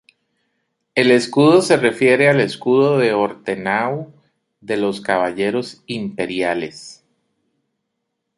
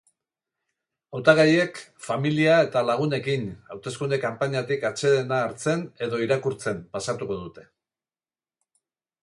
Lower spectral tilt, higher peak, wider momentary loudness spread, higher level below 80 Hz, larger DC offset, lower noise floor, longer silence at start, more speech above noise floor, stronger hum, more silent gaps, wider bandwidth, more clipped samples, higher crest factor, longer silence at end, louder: about the same, -5.5 dB/octave vs -5.5 dB/octave; about the same, 0 dBFS vs -2 dBFS; about the same, 13 LU vs 14 LU; about the same, -62 dBFS vs -64 dBFS; neither; second, -76 dBFS vs under -90 dBFS; second, 0.95 s vs 1.1 s; second, 59 dB vs over 66 dB; neither; neither; about the same, 11.5 kHz vs 11.5 kHz; neither; about the same, 18 dB vs 22 dB; second, 1.45 s vs 1.65 s; first, -17 LUFS vs -24 LUFS